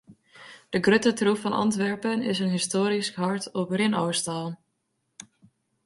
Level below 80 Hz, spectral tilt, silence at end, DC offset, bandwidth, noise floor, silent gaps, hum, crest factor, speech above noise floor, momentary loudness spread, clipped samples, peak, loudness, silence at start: -66 dBFS; -4.5 dB/octave; 1.3 s; under 0.1%; 11.5 kHz; -76 dBFS; none; none; 20 dB; 51 dB; 11 LU; under 0.1%; -8 dBFS; -25 LUFS; 0.1 s